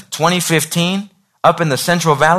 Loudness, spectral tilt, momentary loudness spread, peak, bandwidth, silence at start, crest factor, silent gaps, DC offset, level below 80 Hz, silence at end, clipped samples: -15 LUFS; -4 dB/octave; 4 LU; 0 dBFS; 14 kHz; 0.1 s; 14 dB; none; under 0.1%; -52 dBFS; 0 s; under 0.1%